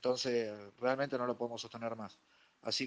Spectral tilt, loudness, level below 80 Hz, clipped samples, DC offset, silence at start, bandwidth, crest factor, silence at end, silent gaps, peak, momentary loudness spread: -4 dB/octave; -38 LUFS; -82 dBFS; under 0.1%; under 0.1%; 0 s; 10 kHz; 18 dB; 0 s; none; -20 dBFS; 12 LU